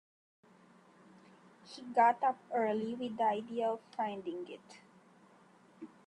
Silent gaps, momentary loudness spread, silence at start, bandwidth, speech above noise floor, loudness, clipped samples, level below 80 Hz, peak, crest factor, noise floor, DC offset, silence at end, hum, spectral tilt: none; 23 LU; 1.65 s; 10.5 kHz; 29 dB; -34 LUFS; under 0.1%; -86 dBFS; -16 dBFS; 20 dB; -63 dBFS; under 0.1%; 0.2 s; none; -5.5 dB/octave